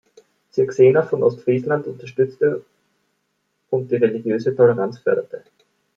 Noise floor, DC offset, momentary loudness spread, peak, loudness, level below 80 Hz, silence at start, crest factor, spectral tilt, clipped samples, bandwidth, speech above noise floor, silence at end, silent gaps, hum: -71 dBFS; under 0.1%; 12 LU; -2 dBFS; -19 LUFS; -66 dBFS; 0.55 s; 18 dB; -8.5 dB/octave; under 0.1%; 7 kHz; 53 dB; 0.6 s; none; none